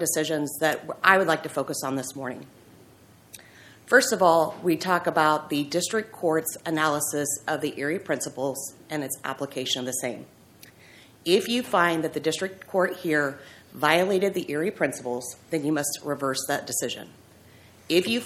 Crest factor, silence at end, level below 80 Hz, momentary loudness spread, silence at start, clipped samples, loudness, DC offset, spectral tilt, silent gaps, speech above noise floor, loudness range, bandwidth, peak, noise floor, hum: 24 dB; 0 s; -70 dBFS; 12 LU; 0 s; under 0.1%; -25 LUFS; under 0.1%; -3 dB/octave; none; 28 dB; 5 LU; 16.5 kHz; -2 dBFS; -54 dBFS; none